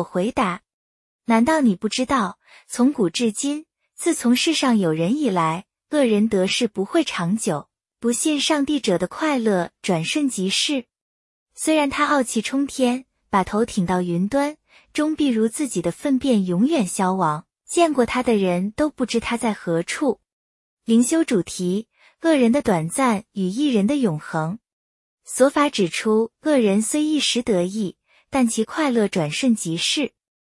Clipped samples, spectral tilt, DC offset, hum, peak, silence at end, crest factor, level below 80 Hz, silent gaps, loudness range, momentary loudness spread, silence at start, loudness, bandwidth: under 0.1%; -4.5 dB/octave; under 0.1%; none; -4 dBFS; 0.35 s; 18 dB; -56 dBFS; 0.73-1.19 s, 11.01-11.46 s, 20.32-20.77 s, 24.73-25.17 s; 2 LU; 8 LU; 0 s; -21 LUFS; 12 kHz